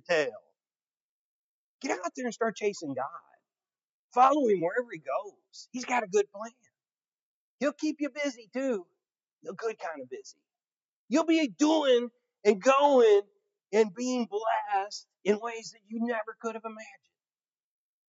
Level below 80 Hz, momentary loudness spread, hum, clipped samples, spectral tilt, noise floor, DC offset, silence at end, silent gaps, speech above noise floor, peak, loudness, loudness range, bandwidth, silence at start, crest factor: under -90 dBFS; 18 LU; none; under 0.1%; -4 dB/octave; under -90 dBFS; under 0.1%; 1.2 s; 1.00-1.79 s, 3.83-4.10 s, 6.94-6.98 s, 7.08-7.59 s, 9.32-9.38 s, 10.84-11.08 s; over 62 dB; -8 dBFS; -29 LUFS; 10 LU; 7.8 kHz; 0.1 s; 22 dB